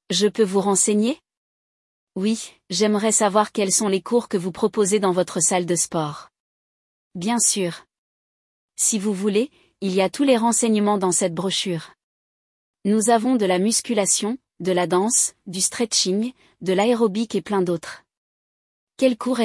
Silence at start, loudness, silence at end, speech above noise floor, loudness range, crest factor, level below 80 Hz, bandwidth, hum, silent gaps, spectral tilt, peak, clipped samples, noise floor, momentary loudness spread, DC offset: 0.1 s; -20 LUFS; 0 s; over 69 dB; 3 LU; 18 dB; -68 dBFS; 12 kHz; none; 1.37-2.07 s, 6.40-7.11 s, 7.98-8.69 s, 12.03-12.74 s, 18.17-18.87 s; -3.5 dB/octave; -4 dBFS; under 0.1%; under -90 dBFS; 11 LU; under 0.1%